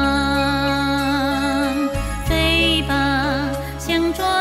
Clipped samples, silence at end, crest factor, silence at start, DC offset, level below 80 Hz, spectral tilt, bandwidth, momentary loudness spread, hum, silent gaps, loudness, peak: under 0.1%; 0 s; 14 dB; 0 s; under 0.1%; -30 dBFS; -4.5 dB/octave; 16 kHz; 7 LU; none; none; -19 LUFS; -4 dBFS